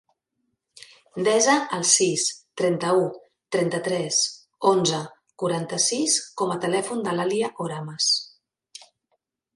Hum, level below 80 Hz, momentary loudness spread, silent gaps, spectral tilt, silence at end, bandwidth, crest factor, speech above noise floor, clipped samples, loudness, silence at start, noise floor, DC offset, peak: none; -72 dBFS; 11 LU; none; -2.5 dB/octave; 1.3 s; 11.5 kHz; 22 dB; 54 dB; under 0.1%; -23 LUFS; 1.15 s; -77 dBFS; under 0.1%; -4 dBFS